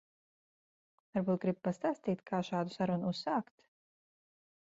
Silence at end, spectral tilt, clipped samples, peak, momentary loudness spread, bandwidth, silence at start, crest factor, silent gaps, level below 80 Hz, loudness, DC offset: 1.3 s; -6 dB/octave; under 0.1%; -20 dBFS; 4 LU; 7.6 kHz; 1.15 s; 18 dB; none; -76 dBFS; -36 LUFS; under 0.1%